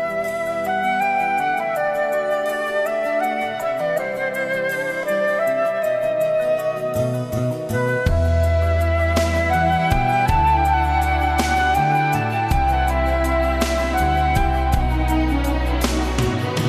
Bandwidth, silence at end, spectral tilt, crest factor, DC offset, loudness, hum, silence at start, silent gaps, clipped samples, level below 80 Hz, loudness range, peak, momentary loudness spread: 14 kHz; 0 s; -6 dB/octave; 16 dB; under 0.1%; -20 LUFS; none; 0 s; none; under 0.1%; -26 dBFS; 3 LU; -4 dBFS; 5 LU